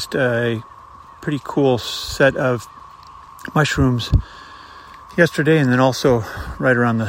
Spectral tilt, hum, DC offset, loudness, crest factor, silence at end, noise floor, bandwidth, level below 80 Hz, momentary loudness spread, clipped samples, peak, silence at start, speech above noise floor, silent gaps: -6 dB/octave; none; under 0.1%; -18 LUFS; 18 dB; 0 s; -41 dBFS; 16 kHz; -34 dBFS; 21 LU; under 0.1%; 0 dBFS; 0 s; 23 dB; none